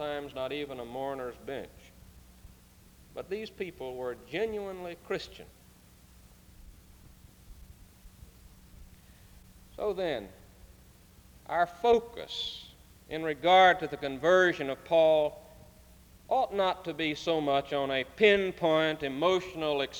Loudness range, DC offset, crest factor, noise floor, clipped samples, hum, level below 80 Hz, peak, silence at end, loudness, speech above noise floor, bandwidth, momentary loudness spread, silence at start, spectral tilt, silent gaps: 15 LU; under 0.1%; 22 dB; -57 dBFS; under 0.1%; none; -58 dBFS; -8 dBFS; 0 s; -29 LUFS; 28 dB; over 20 kHz; 16 LU; 0 s; -4.5 dB/octave; none